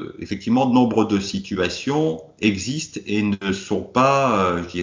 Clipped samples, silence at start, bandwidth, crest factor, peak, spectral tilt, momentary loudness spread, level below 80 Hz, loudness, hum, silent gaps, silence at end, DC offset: under 0.1%; 0 s; 7.6 kHz; 16 dB; -4 dBFS; -5.5 dB/octave; 9 LU; -48 dBFS; -21 LUFS; none; none; 0 s; under 0.1%